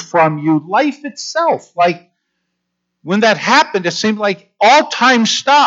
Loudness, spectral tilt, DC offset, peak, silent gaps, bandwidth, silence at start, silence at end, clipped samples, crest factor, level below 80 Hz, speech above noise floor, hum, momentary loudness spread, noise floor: -13 LUFS; -3.5 dB/octave; under 0.1%; -2 dBFS; none; 8 kHz; 0 s; 0 s; under 0.1%; 12 dB; -72 dBFS; 60 dB; 60 Hz at -50 dBFS; 9 LU; -73 dBFS